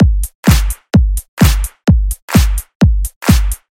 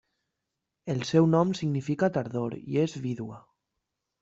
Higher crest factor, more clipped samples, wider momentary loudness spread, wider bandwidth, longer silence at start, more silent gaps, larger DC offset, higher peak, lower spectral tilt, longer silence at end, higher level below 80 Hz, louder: second, 12 dB vs 20 dB; neither; second, 3 LU vs 12 LU; first, 17.5 kHz vs 7.8 kHz; second, 0 s vs 0.85 s; first, 0.35-0.43 s, 1.28-1.37 s, 2.22-2.28 s, 2.75-2.80 s, 3.16-3.21 s vs none; neither; first, 0 dBFS vs -10 dBFS; second, -5.5 dB/octave vs -7 dB/octave; second, 0.2 s vs 0.85 s; first, -14 dBFS vs -66 dBFS; first, -14 LUFS vs -28 LUFS